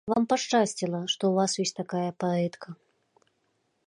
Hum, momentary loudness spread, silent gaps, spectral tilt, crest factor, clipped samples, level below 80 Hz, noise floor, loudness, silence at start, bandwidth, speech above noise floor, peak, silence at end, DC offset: none; 7 LU; none; -4.5 dB/octave; 18 dB; under 0.1%; -72 dBFS; -74 dBFS; -27 LUFS; 0.05 s; 11.5 kHz; 46 dB; -10 dBFS; 1.15 s; under 0.1%